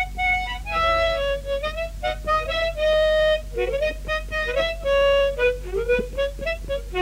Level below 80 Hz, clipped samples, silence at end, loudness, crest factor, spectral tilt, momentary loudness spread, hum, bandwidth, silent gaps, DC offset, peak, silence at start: -34 dBFS; under 0.1%; 0 s; -23 LUFS; 12 dB; -4 dB/octave; 9 LU; none; 16 kHz; none; under 0.1%; -10 dBFS; 0 s